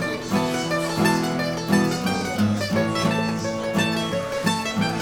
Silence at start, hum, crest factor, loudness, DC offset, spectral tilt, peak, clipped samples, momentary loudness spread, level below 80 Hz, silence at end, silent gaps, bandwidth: 0 s; none; 18 dB; -23 LUFS; under 0.1%; -5 dB/octave; -6 dBFS; under 0.1%; 4 LU; -52 dBFS; 0 s; none; over 20 kHz